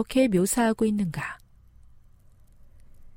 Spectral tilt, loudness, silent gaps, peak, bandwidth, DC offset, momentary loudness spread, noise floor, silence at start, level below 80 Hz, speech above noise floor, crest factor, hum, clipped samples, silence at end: -5 dB/octave; -25 LUFS; none; -10 dBFS; 16.5 kHz; under 0.1%; 14 LU; -54 dBFS; 0 s; -50 dBFS; 30 dB; 16 dB; none; under 0.1%; 0.05 s